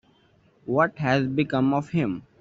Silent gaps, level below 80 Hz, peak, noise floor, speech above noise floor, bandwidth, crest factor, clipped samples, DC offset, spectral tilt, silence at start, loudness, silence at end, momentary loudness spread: none; -60 dBFS; -8 dBFS; -61 dBFS; 37 dB; 7.8 kHz; 18 dB; under 0.1%; under 0.1%; -6 dB/octave; 0.65 s; -24 LUFS; 0.2 s; 6 LU